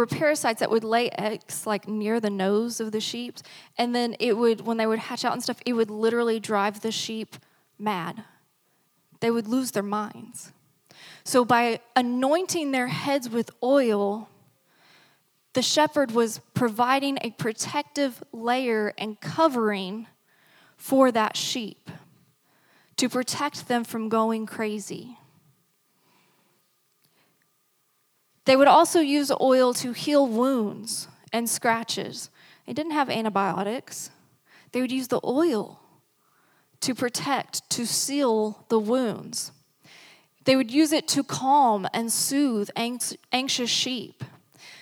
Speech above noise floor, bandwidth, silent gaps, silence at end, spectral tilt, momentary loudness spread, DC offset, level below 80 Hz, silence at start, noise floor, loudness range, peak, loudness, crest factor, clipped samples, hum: 45 dB; 19.5 kHz; none; 0 s; -3.5 dB/octave; 12 LU; under 0.1%; -80 dBFS; 0 s; -69 dBFS; 7 LU; -4 dBFS; -25 LUFS; 22 dB; under 0.1%; none